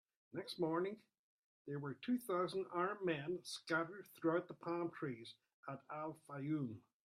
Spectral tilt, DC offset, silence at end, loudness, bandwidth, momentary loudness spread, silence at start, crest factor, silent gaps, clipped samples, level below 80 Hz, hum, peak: -6 dB/octave; under 0.1%; 0.3 s; -43 LUFS; 15.5 kHz; 13 LU; 0.35 s; 18 dB; 1.19-1.65 s, 5.54-5.63 s; under 0.1%; -86 dBFS; none; -26 dBFS